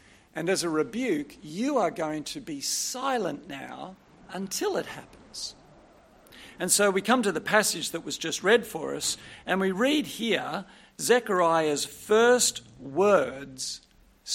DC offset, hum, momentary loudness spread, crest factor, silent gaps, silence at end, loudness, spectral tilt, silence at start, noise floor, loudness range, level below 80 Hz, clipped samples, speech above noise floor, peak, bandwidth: under 0.1%; none; 16 LU; 22 dB; none; 0 s; -26 LUFS; -2.5 dB/octave; 0.35 s; -56 dBFS; 7 LU; -64 dBFS; under 0.1%; 29 dB; -6 dBFS; 16.5 kHz